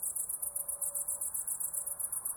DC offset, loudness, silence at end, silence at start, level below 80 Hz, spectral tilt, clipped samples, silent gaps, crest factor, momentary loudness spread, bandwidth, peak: under 0.1%; -34 LUFS; 0 s; 0 s; -70 dBFS; -1.5 dB/octave; under 0.1%; none; 18 dB; 1 LU; 19 kHz; -20 dBFS